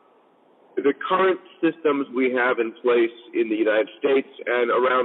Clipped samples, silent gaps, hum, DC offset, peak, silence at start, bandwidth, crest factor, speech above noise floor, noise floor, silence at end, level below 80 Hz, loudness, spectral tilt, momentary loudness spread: under 0.1%; none; none; under 0.1%; -8 dBFS; 0.75 s; 4.1 kHz; 14 dB; 36 dB; -57 dBFS; 0 s; under -90 dBFS; -22 LUFS; -8.5 dB/octave; 4 LU